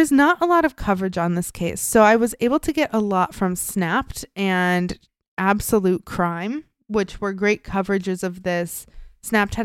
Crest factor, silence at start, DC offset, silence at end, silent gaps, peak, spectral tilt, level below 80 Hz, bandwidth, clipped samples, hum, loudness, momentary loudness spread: 20 dB; 0 s; under 0.1%; 0 s; 5.28-5.37 s; -2 dBFS; -5 dB/octave; -44 dBFS; 16.5 kHz; under 0.1%; none; -21 LUFS; 11 LU